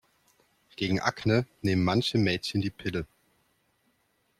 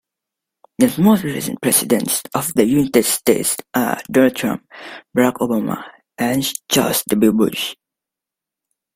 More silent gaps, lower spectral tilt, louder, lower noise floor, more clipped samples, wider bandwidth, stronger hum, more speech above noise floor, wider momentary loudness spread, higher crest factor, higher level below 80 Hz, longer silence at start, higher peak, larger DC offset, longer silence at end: neither; first, -6 dB/octave vs -4 dB/octave; second, -28 LUFS vs -17 LUFS; second, -72 dBFS vs -86 dBFS; neither; second, 14.5 kHz vs 16.5 kHz; neither; second, 44 dB vs 69 dB; about the same, 10 LU vs 10 LU; about the same, 20 dB vs 18 dB; about the same, -58 dBFS vs -54 dBFS; about the same, 0.8 s vs 0.8 s; second, -10 dBFS vs 0 dBFS; neither; first, 1.35 s vs 1.2 s